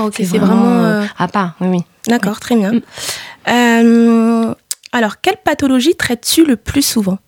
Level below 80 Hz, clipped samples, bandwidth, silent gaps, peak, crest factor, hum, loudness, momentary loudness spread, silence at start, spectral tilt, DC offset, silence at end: -44 dBFS; under 0.1%; 19 kHz; none; 0 dBFS; 12 dB; none; -13 LUFS; 9 LU; 0 s; -4.5 dB/octave; under 0.1%; 0.1 s